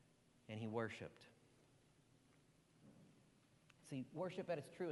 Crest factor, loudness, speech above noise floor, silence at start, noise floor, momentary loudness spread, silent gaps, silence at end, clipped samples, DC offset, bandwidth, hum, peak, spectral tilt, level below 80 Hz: 20 dB; -49 LUFS; 26 dB; 0.5 s; -74 dBFS; 22 LU; none; 0 s; under 0.1%; under 0.1%; 11.5 kHz; none; -32 dBFS; -6.5 dB/octave; -86 dBFS